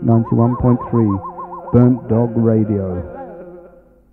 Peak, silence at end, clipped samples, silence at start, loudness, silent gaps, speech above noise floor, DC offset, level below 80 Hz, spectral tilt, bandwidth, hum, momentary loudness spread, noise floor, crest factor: 0 dBFS; 0.45 s; under 0.1%; 0 s; -16 LUFS; none; 31 dB; under 0.1%; -40 dBFS; -13.5 dB/octave; 2.6 kHz; none; 17 LU; -45 dBFS; 16 dB